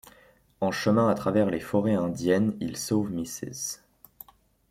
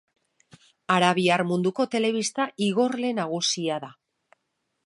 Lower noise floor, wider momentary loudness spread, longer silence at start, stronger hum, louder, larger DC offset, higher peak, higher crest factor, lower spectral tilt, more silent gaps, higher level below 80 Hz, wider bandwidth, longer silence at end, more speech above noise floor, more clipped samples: second, -58 dBFS vs -78 dBFS; first, 11 LU vs 8 LU; second, 0.6 s vs 0.9 s; neither; second, -27 LUFS vs -24 LUFS; neither; second, -10 dBFS vs -6 dBFS; about the same, 18 dB vs 20 dB; first, -5.5 dB/octave vs -4 dB/octave; neither; first, -60 dBFS vs -76 dBFS; first, 16 kHz vs 11.5 kHz; about the same, 0.95 s vs 0.95 s; second, 32 dB vs 53 dB; neither